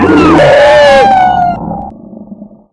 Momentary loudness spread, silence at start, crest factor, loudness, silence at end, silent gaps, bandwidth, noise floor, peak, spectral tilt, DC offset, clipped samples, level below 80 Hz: 17 LU; 0 s; 6 dB; -5 LUFS; 0.3 s; none; 11 kHz; -30 dBFS; 0 dBFS; -5.5 dB/octave; under 0.1%; 0.4%; -32 dBFS